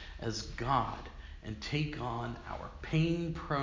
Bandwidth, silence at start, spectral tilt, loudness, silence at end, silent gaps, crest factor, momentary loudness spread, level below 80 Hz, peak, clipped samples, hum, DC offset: 7.6 kHz; 0 s; -6 dB/octave; -36 LUFS; 0 s; none; 22 dB; 13 LU; -48 dBFS; -14 dBFS; under 0.1%; none; under 0.1%